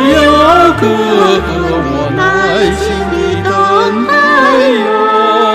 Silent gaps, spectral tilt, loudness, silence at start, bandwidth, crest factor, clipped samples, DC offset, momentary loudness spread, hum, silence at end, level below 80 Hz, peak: none; -5 dB/octave; -9 LUFS; 0 s; 15 kHz; 8 dB; 0.2%; under 0.1%; 7 LU; none; 0 s; -28 dBFS; 0 dBFS